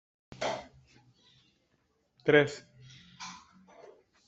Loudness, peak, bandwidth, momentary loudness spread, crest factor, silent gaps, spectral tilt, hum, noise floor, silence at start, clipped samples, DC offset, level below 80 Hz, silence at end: -29 LUFS; -10 dBFS; 8 kHz; 28 LU; 26 dB; none; -5 dB/octave; none; -74 dBFS; 0.4 s; under 0.1%; under 0.1%; -72 dBFS; 0.9 s